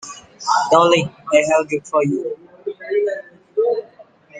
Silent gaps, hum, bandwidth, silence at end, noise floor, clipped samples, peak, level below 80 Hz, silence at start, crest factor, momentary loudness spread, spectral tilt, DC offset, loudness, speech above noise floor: none; none; 9.6 kHz; 0 s; -47 dBFS; under 0.1%; 0 dBFS; -62 dBFS; 0.05 s; 18 dB; 17 LU; -4.5 dB/octave; under 0.1%; -18 LUFS; 30 dB